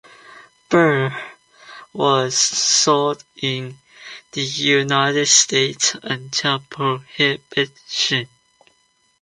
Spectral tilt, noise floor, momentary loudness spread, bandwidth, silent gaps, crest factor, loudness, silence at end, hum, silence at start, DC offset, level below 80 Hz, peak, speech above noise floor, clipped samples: -2.5 dB/octave; -62 dBFS; 15 LU; 11 kHz; none; 18 dB; -18 LUFS; 0.95 s; none; 0.3 s; under 0.1%; -64 dBFS; -2 dBFS; 43 dB; under 0.1%